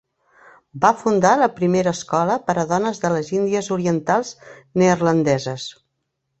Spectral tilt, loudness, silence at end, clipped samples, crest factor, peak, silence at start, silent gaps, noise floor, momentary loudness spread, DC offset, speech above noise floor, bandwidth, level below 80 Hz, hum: -5.5 dB/octave; -19 LUFS; 0.7 s; under 0.1%; 18 dB; -2 dBFS; 0.75 s; none; -75 dBFS; 6 LU; under 0.1%; 56 dB; 8.2 kHz; -58 dBFS; none